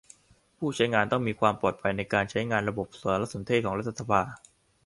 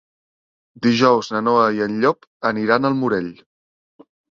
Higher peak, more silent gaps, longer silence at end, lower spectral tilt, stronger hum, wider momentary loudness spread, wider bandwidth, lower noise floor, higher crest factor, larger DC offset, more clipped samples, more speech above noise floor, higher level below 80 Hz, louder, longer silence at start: second, -6 dBFS vs -2 dBFS; second, none vs 2.27-2.40 s; second, 0.5 s vs 1 s; about the same, -5.5 dB/octave vs -6 dB/octave; neither; about the same, 7 LU vs 8 LU; first, 11.5 kHz vs 7.4 kHz; second, -58 dBFS vs under -90 dBFS; about the same, 22 dB vs 18 dB; neither; neither; second, 30 dB vs over 72 dB; about the same, -56 dBFS vs -60 dBFS; second, -28 LUFS vs -18 LUFS; second, 0.6 s vs 0.75 s